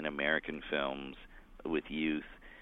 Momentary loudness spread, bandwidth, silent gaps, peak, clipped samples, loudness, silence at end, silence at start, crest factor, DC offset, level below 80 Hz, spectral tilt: 15 LU; 4.1 kHz; none; -16 dBFS; under 0.1%; -36 LUFS; 0 s; 0 s; 22 dB; under 0.1%; -56 dBFS; -7 dB/octave